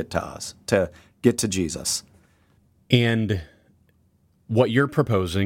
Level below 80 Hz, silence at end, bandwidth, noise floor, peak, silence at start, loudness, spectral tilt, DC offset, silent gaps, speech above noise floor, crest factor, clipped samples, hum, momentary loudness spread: -50 dBFS; 0 s; 16.5 kHz; -62 dBFS; -4 dBFS; 0 s; -23 LUFS; -5 dB/octave; under 0.1%; none; 40 dB; 20 dB; under 0.1%; none; 9 LU